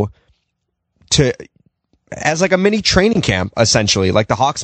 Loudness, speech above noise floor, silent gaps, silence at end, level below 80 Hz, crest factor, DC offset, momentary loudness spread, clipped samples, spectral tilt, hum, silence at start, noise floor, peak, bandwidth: -15 LUFS; 58 dB; none; 0 s; -36 dBFS; 16 dB; under 0.1%; 8 LU; under 0.1%; -4 dB/octave; none; 0 s; -73 dBFS; 0 dBFS; 9.2 kHz